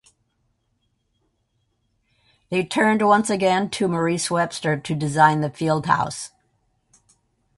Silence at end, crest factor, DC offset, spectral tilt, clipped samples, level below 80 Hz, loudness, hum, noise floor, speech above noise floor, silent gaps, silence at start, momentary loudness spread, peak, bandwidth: 1.3 s; 20 dB; under 0.1%; -5 dB/octave; under 0.1%; -60 dBFS; -21 LUFS; none; -70 dBFS; 50 dB; none; 2.5 s; 9 LU; -2 dBFS; 11.5 kHz